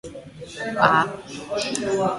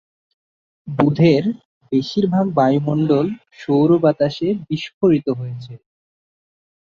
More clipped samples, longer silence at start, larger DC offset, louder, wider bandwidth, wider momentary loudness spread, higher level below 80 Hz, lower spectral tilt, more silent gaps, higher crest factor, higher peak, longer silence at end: neither; second, 0.05 s vs 0.85 s; neither; second, -22 LUFS vs -18 LUFS; first, 11.5 kHz vs 7.2 kHz; first, 20 LU vs 15 LU; about the same, -56 dBFS vs -56 dBFS; second, -4 dB/octave vs -8.5 dB/octave; second, none vs 1.65-1.81 s, 4.94-5.01 s; about the same, 22 dB vs 18 dB; about the same, 0 dBFS vs 0 dBFS; second, 0 s vs 1.05 s